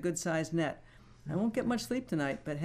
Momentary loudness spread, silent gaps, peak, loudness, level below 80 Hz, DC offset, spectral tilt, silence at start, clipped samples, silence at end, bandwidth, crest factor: 6 LU; none; -20 dBFS; -34 LUFS; -60 dBFS; under 0.1%; -5.5 dB/octave; 0 s; under 0.1%; 0 s; 15.5 kHz; 14 dB